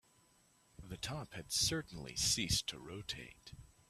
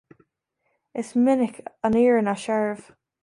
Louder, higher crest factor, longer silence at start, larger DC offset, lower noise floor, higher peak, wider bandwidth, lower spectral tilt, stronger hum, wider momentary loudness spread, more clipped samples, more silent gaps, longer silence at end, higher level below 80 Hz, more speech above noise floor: second, -38 LUFS vs -22 LUFS; first, 20 dB vs 14 dB; second, 0.8 s vs 0.95 s; neither; second, -71 dBFS vs -75 dBFS; second, -22 dBFS vs -10 dBFS; first, 15 kHz vs 11.5 kHz; second, -2 dB/octave vs -6.5 dB/octave; neither; first, 20 LU vs 14 LU; neither; neither; second, 0.25 s vs 0.45 s; about the same, -58 dBFS vs -62 dBFS; second, 31 dB vs 53 dB